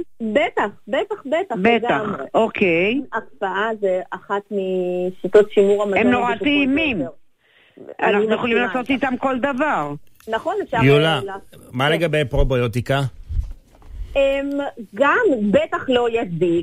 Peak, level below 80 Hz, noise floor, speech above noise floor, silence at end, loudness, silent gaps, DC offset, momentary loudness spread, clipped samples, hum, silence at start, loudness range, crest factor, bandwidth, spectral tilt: -4 dBFS; -36 dBFS; -55 dBFS; 36 dB; 0 s; -19 LUFS; none; 0.3%; 10 LU; under 0.1%; none; 0 s; 3 LU; 16 dB; 15 kHz; -6.5 dB/octave